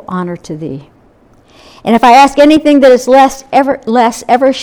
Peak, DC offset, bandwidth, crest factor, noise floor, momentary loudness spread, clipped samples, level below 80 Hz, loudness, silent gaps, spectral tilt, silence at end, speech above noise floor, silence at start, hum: 0 dBFS; under 0.1%; 18 kHz; 10 dB; -45 dBFS; 17 LU; 2%; -42 dBFS; -8 LUFS; none; -5 dB/octave; 0 s; 37 dB; 0.1 s; none